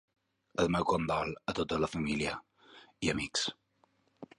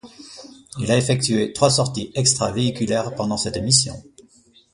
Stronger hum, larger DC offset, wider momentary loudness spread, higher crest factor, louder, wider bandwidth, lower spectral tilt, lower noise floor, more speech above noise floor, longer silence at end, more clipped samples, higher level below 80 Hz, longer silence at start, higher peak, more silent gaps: neither; neither; second, 7 LU vs 22 LU; about the same, 20 dB vs 20 dB; second, -33 LUFS vs -20 LUFS; about the same, 11.5 kHz vs 11.5 kHz; about the same, -4.5 dB/octave vs -4 dB/octave; first, -72 dBFS vs -54 dBFS; first, 39 dB vs 34 dB; second, 0.15 s vs 0.55 s; neither; second, -56 dBFS vs -48 dBFS; first, 0.6 s vs 0.05 s; second, -16 dBFS vs -2 dBFS; neither